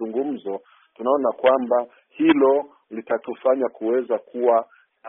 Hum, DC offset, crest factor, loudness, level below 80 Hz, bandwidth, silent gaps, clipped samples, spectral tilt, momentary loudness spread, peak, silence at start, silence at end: none; under 0.1%; 18 dB; -21 LUFS; -70 dBFS; 3.8 kHz; none; under 0.1%; -0.5 dB/octave; 16 LU; -4 dBFS; 0 s; 0 s